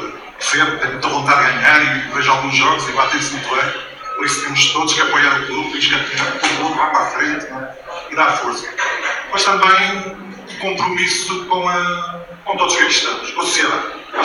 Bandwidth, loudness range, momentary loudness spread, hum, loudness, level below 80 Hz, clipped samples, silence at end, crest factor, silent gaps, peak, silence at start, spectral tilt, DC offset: 16 kHz; 3 LU; 12 LU; none; -15 LUFS; -52 dBFS; under 0.1%; 0 s; 16 dB; none; 0 dBFS; 0 s; -1.5 dB/octave; under 0.1%